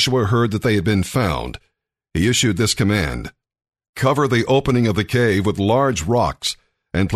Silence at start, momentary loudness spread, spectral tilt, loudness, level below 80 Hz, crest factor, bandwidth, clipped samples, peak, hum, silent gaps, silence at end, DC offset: 0 s; 10 LU; -5 dB/octave; -18 LUFS; -38 dBFS; 14 dB; 13.5 kHz; under 0.1%; -4 dBFS; none; 3.89-3.93 s; 0 s; under 0.1%